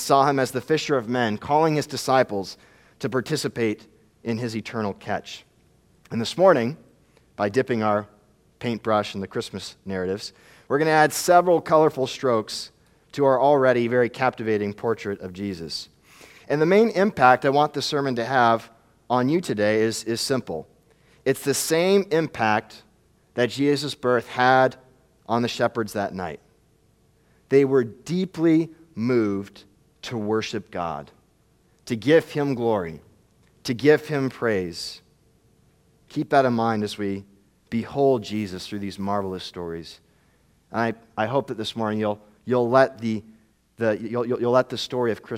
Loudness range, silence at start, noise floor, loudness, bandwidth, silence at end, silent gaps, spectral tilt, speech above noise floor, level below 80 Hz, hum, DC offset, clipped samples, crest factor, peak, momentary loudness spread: 7 LU; 0 s; -61 dBFS; -23 LUFS; 16.5 kHz; 0 s; none; -5 dB/octave; 39 dB; -64 dBFS; none; under 0.1%; under 0.1%; 22 dB; -2 dBFS; 14 LU